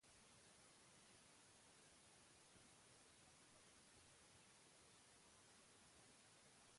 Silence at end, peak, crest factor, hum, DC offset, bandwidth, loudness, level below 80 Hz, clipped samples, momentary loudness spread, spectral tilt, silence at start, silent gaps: 0 s; -56 dBFS; 14 dB; none; under 0.1%; 11.5 kHz; -68 LUFS; -88 dBFS; under 0.1%; 0 LU; -2 dB/octave; 0 s; none